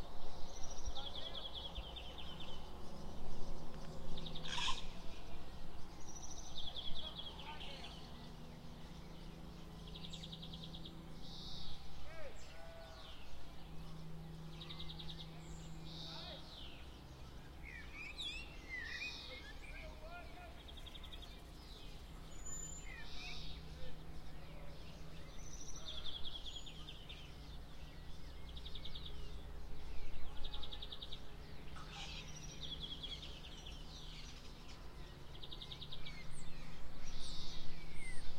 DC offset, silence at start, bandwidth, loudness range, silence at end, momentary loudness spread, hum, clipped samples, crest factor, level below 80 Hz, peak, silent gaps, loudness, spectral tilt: under 0.1%; 0 s; 10.5 kHz; 5 LU; 0 s; 9 LU; none; under 0.1%; 16 dB; -52 dBFS; -24 dBFS; none; -50 LUFS; -3.5 dB/octave